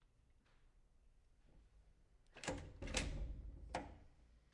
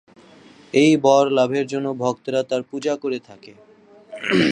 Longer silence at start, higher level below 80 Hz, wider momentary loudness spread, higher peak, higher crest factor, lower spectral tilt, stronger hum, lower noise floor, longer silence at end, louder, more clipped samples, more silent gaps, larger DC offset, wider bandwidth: second, 0.3 s vs 0.75 s; first, -56 dBFS vs -66 dBFS; first, 16 LU vs 12 LU; second, -24 dBFS vs -2 dBFS; first, 28 dB vs 18 dB; second, -3.5 dB/octave vs -5 dB/octave; neither; first, -73 dBFS vs -47 dBFS; first, 0.15 s vs 0 s; second, -48 LUFS vs -20 LUFS; neither; neither; neither; about the same, 11 kHz vs 10.5 kHz